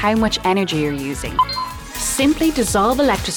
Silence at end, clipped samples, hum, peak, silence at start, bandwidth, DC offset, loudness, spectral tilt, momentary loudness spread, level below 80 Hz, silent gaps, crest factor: 0 s; under 0.1%; none; -6 dBFS; 0 s; over 20 kHz; under 0.1%; -18 LUFS; -4 dB/octave; 8 LU; -34 dBFS; none; 12 dB